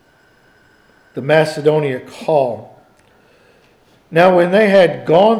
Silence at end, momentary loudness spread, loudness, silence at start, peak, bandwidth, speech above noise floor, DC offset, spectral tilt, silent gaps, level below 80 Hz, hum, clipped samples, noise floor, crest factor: 0 s; 13 LU; -14 LUFS; 1.15 s; 0 dBFS; 13 kHz; 39 dB; under 0.1%; -6.5 dB/octave; none; -64 dBFS; none; under 0.1%; -52 dBFS; 14 dB